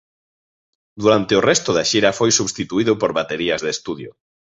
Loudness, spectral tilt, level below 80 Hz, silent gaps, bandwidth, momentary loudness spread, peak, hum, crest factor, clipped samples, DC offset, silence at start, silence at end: -18 LUFS; -3.5 dB/octave; -54 dBFS; none; 8.2 kHz; 10 LU; -2 dBFS; none; 18 dB; under 0.1%; under 0.1%; 0.95 s; 0.5 s